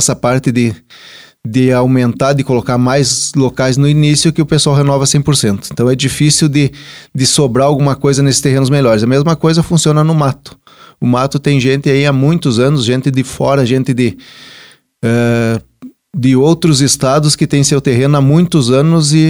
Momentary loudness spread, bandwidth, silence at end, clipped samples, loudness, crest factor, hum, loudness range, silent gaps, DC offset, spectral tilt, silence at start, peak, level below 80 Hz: 6 LU; over 20 kHz; 0 s; under 0.1%; -11 LUFS; 10 dB; none; 3 LU; none; 0.2%; -5 dB/octave; 0 s; 0 dBFS; -42 dBFS